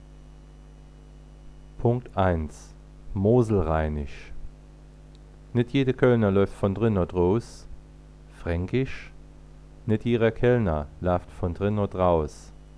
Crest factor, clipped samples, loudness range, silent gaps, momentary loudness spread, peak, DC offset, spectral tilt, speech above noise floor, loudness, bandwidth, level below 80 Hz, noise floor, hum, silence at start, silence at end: 20 dB; under 0.1%; 4 LU; none; 18 LU; -6 dBFS; under 0.1%; -8.5 dB/octave; 23 dB; -25 LUFS; 11 kHz; -40 dBFS; -47 dBFS; none; 0 s; 0.1 s